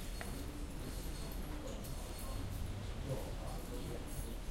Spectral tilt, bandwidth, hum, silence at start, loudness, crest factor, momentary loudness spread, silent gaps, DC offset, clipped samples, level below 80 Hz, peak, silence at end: -5 dB/octave; 16 kHz; none; 0 s; -45 LUFS; 18 dB; 3 LU; none; under 0.1%; under 0.1%; -46 dBFS; -26 dBFS; 0 s